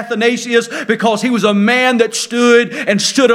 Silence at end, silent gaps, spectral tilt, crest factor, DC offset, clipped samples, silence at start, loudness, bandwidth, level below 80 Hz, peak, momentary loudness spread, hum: 0 s; none; -3.5 dB/octave; 12 dB; under 0.1%; under 0.1%; 0 s; -13 LUFS; 15.5 kHz; -64 dBFS; 0 dBFS; 5 LU; none